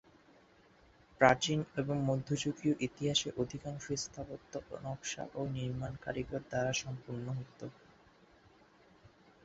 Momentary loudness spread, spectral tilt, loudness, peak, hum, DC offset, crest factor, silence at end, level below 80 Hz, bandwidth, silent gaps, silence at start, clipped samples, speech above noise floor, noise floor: 14 LU; -4 dB/octave; -36 LUFS; -10 dBFS; none; under 0.1%; 28 dB; 1.75 s; -62 dBFS; 8 kHz; none; 1.2 s; under 0.1%; 28 dB; -64 dBFS